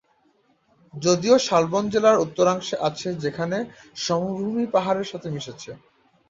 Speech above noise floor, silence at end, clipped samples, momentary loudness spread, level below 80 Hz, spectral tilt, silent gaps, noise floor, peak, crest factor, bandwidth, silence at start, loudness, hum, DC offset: 41 dB; 0.55 s; under 0.1%; 15 LU; -62 dBFS; -5 dB/octave; none; -64 dBFS; -4 dBFS; 20 dB; 7.8 kHz; 0.95 s; -23 LUFS; none; under 0.1%